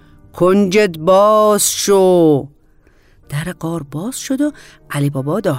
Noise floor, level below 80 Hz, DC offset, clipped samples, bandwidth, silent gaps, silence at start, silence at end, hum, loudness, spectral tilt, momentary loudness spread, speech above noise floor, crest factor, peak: -50 dBFS; -48 dBFS; under 0.1%; under 0.1%; 16 kHz; none; 0.35 s; 0 s; none; -14 LUFS; -5 dB/octave; 13 LU; 36 dB; 12 dB; -2 dBFS